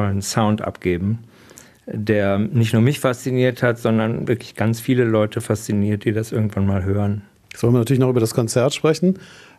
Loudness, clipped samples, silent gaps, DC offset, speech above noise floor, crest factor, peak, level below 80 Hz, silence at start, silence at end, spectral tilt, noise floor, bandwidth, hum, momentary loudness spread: -20 LUFS; under 0.1%; none; under 0.1%; 27 dB; 18 dB; -2 dBFS; -52 dBFS; 0 s; 0.25 s; -6.5 dB/octave; -46 dBFS; 14 kHz; none; 7 LU